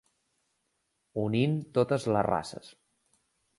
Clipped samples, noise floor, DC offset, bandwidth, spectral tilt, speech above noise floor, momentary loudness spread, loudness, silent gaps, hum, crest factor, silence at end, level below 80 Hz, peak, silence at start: under 0.1%; -78 dBFS; under 0.1%; 11.5 kHz; -7 dB/octave; 50 dB; 13 LU; -29 LUFS; none; none; 22 dB; 0.9 s; -62 dBFS; -10 dBFS; 1.15 s